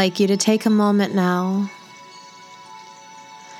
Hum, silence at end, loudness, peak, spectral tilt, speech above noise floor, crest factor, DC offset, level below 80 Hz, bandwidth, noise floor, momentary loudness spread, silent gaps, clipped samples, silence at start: none; 0 s; -19 LUFS; -2 dBFS; -5 dB/octave; 24 dB; 20 dB; under 0.1%; -78 dBFS; 14 kHz; -42 dBFS; 24 LU; none; under 0.1%; 0 s